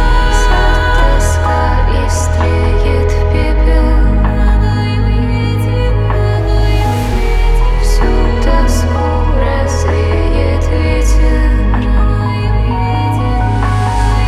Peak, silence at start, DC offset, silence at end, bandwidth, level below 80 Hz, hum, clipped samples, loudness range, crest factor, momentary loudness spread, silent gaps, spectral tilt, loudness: 0 dBFS; 0 s; under 0.1%; 0 s; 12.5 kHz; -12 dBFS; none; under 0.1%; 1 LU; 10 dB; 2 LU; none; -6 dB/octave; -13 LUFS